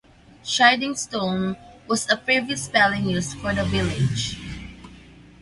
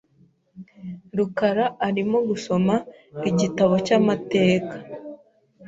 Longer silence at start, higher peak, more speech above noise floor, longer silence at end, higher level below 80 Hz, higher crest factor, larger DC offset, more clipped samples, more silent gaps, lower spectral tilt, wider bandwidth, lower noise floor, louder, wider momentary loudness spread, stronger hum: about the same, 0.45 s vs 0.55 s; first, -2 dBFS vs -6 dBFS; second, 24 dB vs 38 dB; first, 0.2 s vs 0 s; first, -44 dBFS vs -60 dBFS; about the same, 22 dB vs 18 dB; neither; neither; neither; second, -4 dB/octave vs -6.5 dB/octave; first, 11.5 kHz vs 7.8 kHz; second, -46 dBFS vs -59 dBFS; about the same, -22 LUFS vs -22 LUFS; about the same, 18 LU vs 19 LU; neither